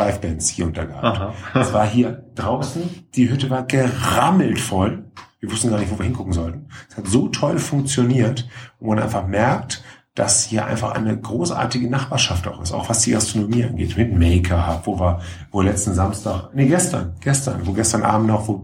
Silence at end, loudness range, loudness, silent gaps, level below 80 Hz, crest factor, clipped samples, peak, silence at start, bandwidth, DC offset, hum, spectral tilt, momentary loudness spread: 0 s; 2 LU; -20 LUFS; none; -36 dBFS; 18 dB; under 0.1%; -2 dBFS; 0 s; 17 kHz; under 0.1%; none; -5 dB/octave; 10 LU